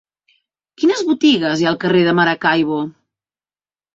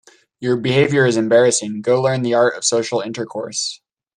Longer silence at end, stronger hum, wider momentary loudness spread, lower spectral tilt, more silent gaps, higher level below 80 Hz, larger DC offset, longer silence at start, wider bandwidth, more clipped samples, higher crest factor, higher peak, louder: first, 1.05 s vs 0.4 s; neither; second, 6 LU vs 11 LU; first, -5.5 dB/octave vs -4 dB/octave; neither; about the same, -60 dBFS vs -60 dBFS; neither; first, 0.8 s vs 0.4 s; second, 7.8 kHz vs 11 kHz; neither; about the same, 16 dB vs 16 dB; about the same, -2 dBFS vs -2 dBFS; about the same, -15 LUFS vs -17 LUFS